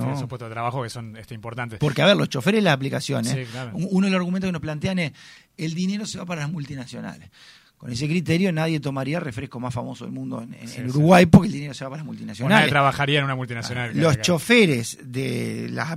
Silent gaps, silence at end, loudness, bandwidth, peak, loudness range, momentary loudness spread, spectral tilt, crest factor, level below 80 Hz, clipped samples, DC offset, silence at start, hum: none; 0 s; -22 LUFS; 15.5 kHz; 0 dBFS; 8 LU; 17 LU; -5.5 dB/octave; 22 dB; -50 dBFS; under 0.1%; under 0.1%; 0 s; none